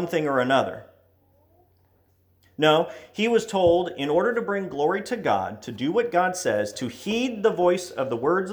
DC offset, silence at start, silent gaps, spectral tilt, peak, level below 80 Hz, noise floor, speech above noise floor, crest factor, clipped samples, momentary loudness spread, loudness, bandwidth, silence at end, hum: under 0.1%; 0 s; none; -5 dB/octave; -6 dBFS; -60 dBFS; -63 dBFS; 40 dB; 18 dB; under 0.1%; 9 LU; -24 LUFS; over 20 kHz; 0 s; none